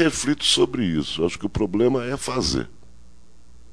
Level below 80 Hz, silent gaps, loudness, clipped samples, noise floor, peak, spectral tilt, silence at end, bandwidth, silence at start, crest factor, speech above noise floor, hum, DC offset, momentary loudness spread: -42 dBFS; none; -22 LUFS; under 0.1%; -52 dBFS; -6 dBFS; -4 dB/octave; 1.05 s; 11 kHz; 0 s; 18 dB; 30 dB; none; 1%; 8 LU